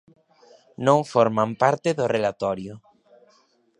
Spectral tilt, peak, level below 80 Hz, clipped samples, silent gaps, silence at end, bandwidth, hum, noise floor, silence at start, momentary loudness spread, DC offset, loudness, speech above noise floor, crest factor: -6 dB/octave; -2 dBFS; -64 dBFS; under 0.1%; none; 1 s; 10.5 kHz; none; -62 dBFS; 0.8 s; 9 LU; under 0.1%; -22 LUFS; 40 dB; 22 dB